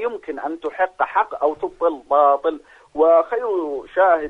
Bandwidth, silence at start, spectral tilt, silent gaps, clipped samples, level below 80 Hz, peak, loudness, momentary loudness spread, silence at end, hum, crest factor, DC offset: 4.4 kHz; 0 s; -5.5 dB/octave; none; under 0.1%; -58 dBFS; -4 dBFS; -20 LUFS; 12 LU; 0 s; none; 14 dB; under 0.1%